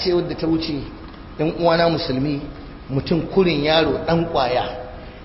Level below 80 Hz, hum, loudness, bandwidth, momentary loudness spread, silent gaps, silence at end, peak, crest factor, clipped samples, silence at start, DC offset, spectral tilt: -40 dBFS; none; -20 LUFS; 5.8 kHz; 18 LU; none; 0 s; -4 dBFS; 18 dB; under 0.1%; 0 s; under 0.1%; -10 dB/octave